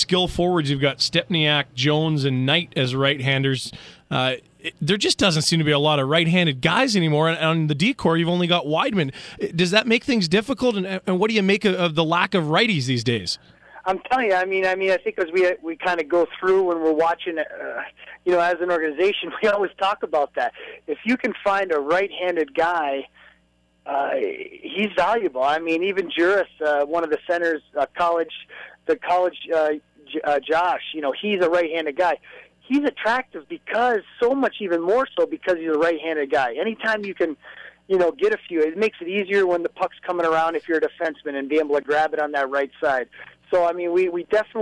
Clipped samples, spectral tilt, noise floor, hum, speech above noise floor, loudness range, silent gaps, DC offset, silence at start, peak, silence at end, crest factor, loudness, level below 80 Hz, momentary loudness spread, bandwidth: under 0.1%; -5 dB/octave; -62 dBFS; none; 41 dB; 4 LU; none; under 0.1%; 0 s; -2 dBFS; 0 s; 18 dB; -21 LUFS; -56 dBFS; 9 LU; 11 kHz